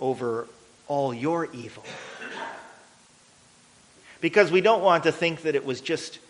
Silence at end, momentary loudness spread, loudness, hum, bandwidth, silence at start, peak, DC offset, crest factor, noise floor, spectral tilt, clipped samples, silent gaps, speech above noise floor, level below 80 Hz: 0.1 s; 20 LU; -24 LUFS; none; 10.5 kHz; 0 s; -4 dBFS; under 0.1%; 22 dB; -56 dBFS; -5 dB/octave; under 0.1%; none; 32 dB; -72 dBFS